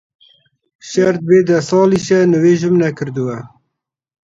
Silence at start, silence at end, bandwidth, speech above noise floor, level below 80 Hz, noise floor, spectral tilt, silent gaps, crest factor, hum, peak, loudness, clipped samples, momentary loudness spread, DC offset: 0.85 s; 0.75 s; 7.8 kHz; 63 dB; -56 dBFS; -75 dBFS; -6.5 dB/octave; none; 14 dB; none; 0 dBFS; -14 LUFS; under 0.1%; 10 LU; under 0.1%